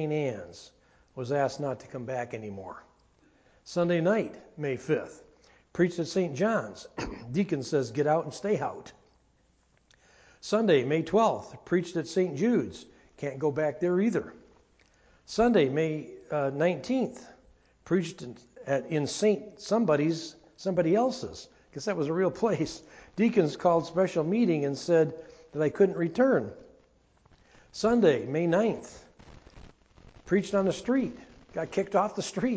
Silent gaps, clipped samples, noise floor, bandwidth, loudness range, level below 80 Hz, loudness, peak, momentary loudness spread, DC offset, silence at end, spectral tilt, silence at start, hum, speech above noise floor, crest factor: none; under 0.1%; -67 dBFS; 8 kHz; 5 LU; -60 dBFS; -28 LUFS; -10 dBFS; 16 LU; under 0.1%; 0 s; -6.5 dB/octave; 0 s; none; 39 dB; 18 dB